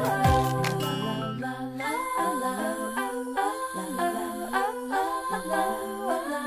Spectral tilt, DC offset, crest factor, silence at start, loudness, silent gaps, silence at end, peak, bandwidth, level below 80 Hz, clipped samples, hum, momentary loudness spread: -5 dB/octave; under 0.1%; 16 dB; 0 s; -28 LUFS; none; 0 s; -12 dBFS; 16 kHz; -44 dBFS; under 0.1%; none; 8 LU